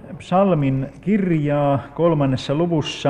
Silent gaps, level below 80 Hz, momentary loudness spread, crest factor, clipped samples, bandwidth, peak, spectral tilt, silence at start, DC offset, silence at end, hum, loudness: none; -48 dBFS; 4 LU; 14 dB; under 0.1%; 9.6 kHz; -6 dBFS; -7.5 dB/octave; 0.05 s; under 0.1%; 0 s; none; -19 LUFS